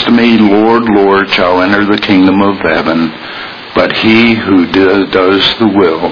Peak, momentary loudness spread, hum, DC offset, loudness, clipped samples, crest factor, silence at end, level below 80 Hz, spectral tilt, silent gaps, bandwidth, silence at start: 0 dBFS; 6 LU; none; under 0.1%; -8 LUFS; 0.9%; 8 dB; 0 s; -40 dBFS; -6.5 dB/octave; none; 5.4 kHz; 0 s